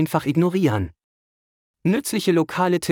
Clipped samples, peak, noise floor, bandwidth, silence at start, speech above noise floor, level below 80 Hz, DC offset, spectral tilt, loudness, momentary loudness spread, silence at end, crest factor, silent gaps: under 0.1%; -6 dBFS; under -90 dBFS; 19 kHz; 0 s; over 70 dB; -56 dBFS; under 0.1%; -6 dB/octave; -21 LUFS; 7 LU; 0 s; 16 dB; 1.04-1.74 s